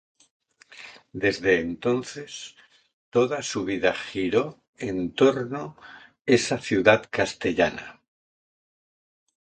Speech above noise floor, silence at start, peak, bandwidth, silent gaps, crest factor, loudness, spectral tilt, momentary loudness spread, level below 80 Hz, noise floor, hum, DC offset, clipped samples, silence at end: 23 dB; 0.7 s; -2 dBFS; 9.4 kHz; 2.93-3.12 s, 4.68-4.73 s, 6.21-6.25 s; 24 dB; -24 LUFS; -4.5 dB/octave; 18 LU; -58 dBFS; -47 dBFS; none; under 0.1%; under 0.1%; 1.65 s